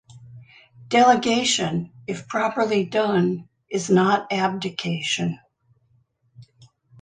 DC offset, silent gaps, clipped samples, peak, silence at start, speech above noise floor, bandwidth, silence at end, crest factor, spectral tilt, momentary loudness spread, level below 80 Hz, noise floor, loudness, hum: under 0.1%; none; under 0.1%; -4 dBFS; 0.15 s; 43 dB; 9.8 kHz; 0.55 s; 18 dB; -4.5 dB/octave; 13 LU; -64 dBFS; -64 dBFS; -22 LUFS; none